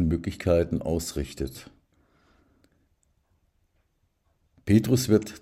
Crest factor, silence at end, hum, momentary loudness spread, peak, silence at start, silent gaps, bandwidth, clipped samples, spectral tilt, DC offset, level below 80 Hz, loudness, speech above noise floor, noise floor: 20 dB; 0.05 s; none; 14 LU; -8 dBFS; 0 s; none; 16 kHz; under 0.1%; -6.5 dB/octave; under 0.1%; -46 dBFS; -26 LUFS; 46 dB; -71 dBFS